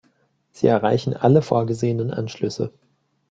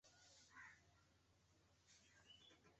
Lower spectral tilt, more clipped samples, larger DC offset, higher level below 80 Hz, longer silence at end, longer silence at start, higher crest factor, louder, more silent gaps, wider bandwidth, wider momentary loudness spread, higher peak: first, -7.5 dB/octave vs -1 dB/octave; neither; neither; first, -58 dBFS vs -86 dBFS; first, 0.6 s vs 0 s; first, 0.6 s vs 0.05 s; about the same, 20 dB vs 20 dB; first, -21 LUFS vs -66 LUFS; neither; about the same, 7.8 kHz vs 8 kHz; first, 9 LU vs 5 LU; first, -2 dBFS vs -52 dBFS